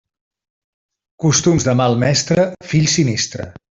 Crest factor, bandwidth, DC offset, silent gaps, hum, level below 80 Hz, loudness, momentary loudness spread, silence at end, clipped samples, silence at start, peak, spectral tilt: 14 dB; 7.8 kHz; under 0.1%; none; none; -46 dBFS; -16 LUFS; 7 LU; 0.2 s; under 0.1%; 1.2 s; -2 dBFS; -4.5 dB/octave